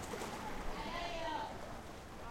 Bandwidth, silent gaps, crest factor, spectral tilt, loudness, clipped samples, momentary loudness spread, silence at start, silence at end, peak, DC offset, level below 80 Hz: 16 kHz; none; 14 dB; -4 dB/octave; -44 LUFS; under 0.1%; 9 LU; 0 s; 0 s; -30 dBFS; under 0.1%; -52 dBFS